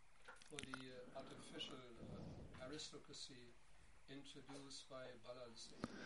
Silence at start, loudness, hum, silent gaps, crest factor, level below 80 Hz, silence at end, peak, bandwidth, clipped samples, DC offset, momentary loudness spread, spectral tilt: 0 s; -56 LUFS; none; none; 30 dB; -72 dBFS; 0 s; -28 dBFS; 11.5 kHz; under 0.1%; under 0.1%; 8 LU; -3.5 dB/octave